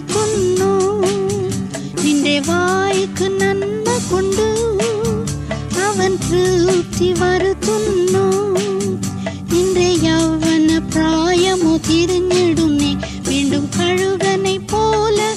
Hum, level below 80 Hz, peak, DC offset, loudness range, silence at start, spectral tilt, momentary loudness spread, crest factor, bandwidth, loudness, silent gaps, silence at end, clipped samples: none; -36 dBFS; -4 dBFS; under 0.1%; 2 LU; 0 s; -4.5 dB/octave; 5 LU; 12 dB; 14.5 kHz; -16 LUFS; none; 0 s; under 0.1%